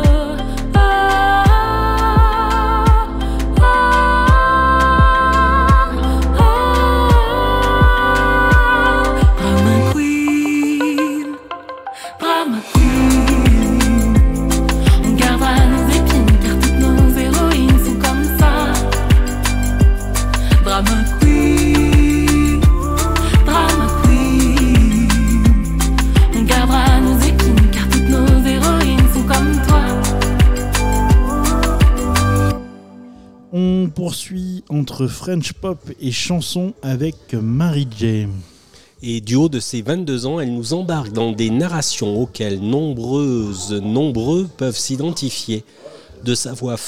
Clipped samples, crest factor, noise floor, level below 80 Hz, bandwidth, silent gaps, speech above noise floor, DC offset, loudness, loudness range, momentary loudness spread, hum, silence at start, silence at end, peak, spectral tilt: under 0.1%; 10 dB; -47 dBFS; -16 dBFS; 16.5 kHz; none; 27 dB; under 0.1%; -15 LUFS; 8 LU; 10 LU; none; 0 s; 0 s; -2 dBFS; -5.5 dB/octave